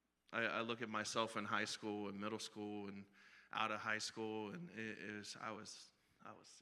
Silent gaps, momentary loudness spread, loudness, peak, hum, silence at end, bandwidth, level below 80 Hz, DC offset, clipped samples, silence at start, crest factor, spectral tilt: none; 17 LU; -45 LUFS; -24 dBFS; none; 0 s; 13 kHz; -90 dBFS; under 0.1%; under 0.1%; 0.3 s; 24 dB; -3.5 dB/octave